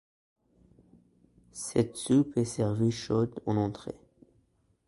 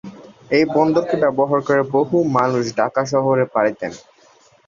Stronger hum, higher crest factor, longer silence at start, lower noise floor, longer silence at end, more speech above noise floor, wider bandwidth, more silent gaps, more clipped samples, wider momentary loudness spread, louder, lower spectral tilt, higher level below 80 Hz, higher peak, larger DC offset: neither; about the same, 20 dB vs 16 dB; first, 1.55 s vs 0.05 s; first, -70 dBFS vs -52 dBFS; first, 0.95 s vs 0.7 s; first, 41 dB vs 35 dB; first, 11.5 kHz vs 7.4 kHz; neither; neither; first, 17 LU vs 4 LU; second, -29 LUFS vs -18 LUFS; about the same, -6.5 dB/octave vs -6.5 dB/octave; about the same, -60 dBFS vs -60 dBFS; second, -12 dBFS vs -2 dBFS; neither